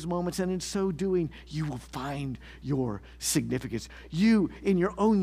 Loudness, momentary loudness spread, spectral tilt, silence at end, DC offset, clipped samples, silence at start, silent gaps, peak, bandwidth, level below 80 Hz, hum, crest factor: -29 LUFS; 12 LU; -5.5 dB/octave; 0 s; under 0.1%; under 0.1%; 0 s; none; -14 dBFS; 15.5 kHz; -50 dBFS; none; 16 dB